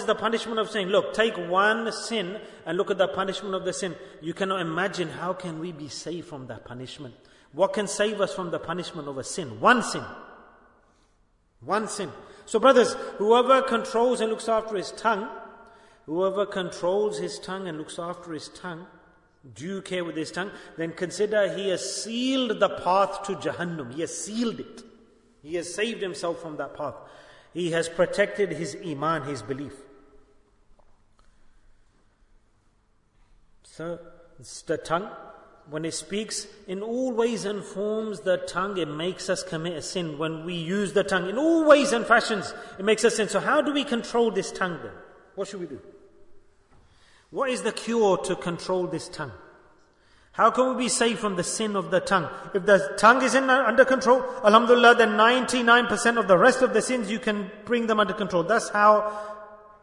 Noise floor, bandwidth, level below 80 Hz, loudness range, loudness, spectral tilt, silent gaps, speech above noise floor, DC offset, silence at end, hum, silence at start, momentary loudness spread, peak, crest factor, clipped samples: -64 dBFS; 11 kHz; -62 dBFS; 14 LU; -24 LUFS; -4 dB/octave; none; 40 dB; under 0.1%; 0.25 s; none; 0 s; 18 LU; -4 dBFS; 22 dB; under 0.1%